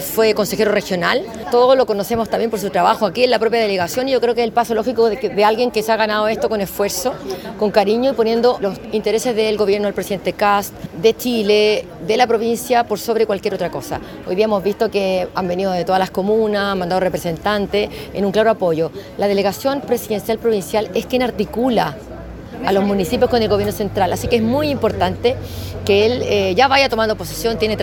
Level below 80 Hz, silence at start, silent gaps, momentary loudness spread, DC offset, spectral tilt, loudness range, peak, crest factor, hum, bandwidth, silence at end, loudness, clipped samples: -42 dBFS; 0 s; none; 7 LU; under 0.1%; -4.5 dB/octave; 3 LU; 0 dBFS; 16 dB; none; 17.5 kHz; 0 s; -17 LUFS; under 0.1%